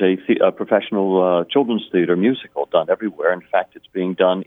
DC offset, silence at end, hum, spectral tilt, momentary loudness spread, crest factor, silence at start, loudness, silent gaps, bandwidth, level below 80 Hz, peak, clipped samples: under 0.1%; 0.05 s; none; -9 dB/octave; 5 LU; 18 dB; 0 s; -19 LUFS; none; 3.9 kHz; -70 dBFS; 0 dBFS; under 0.1%